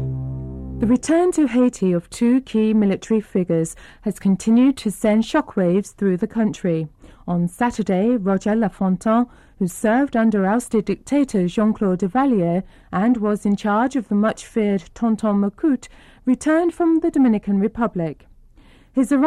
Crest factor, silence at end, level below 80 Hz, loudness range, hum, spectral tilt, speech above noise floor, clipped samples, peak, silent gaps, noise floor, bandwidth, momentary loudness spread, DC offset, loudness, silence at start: 12 dB; 0 s; -46 dBFS; 2 LU; none; -7 dB/octave; 30 dB; under 0.1%; -8 dBFS; none; -49 dBFS; 13.5 kHz; 8 LU; under 0.1%; -20 LUFS; 0 s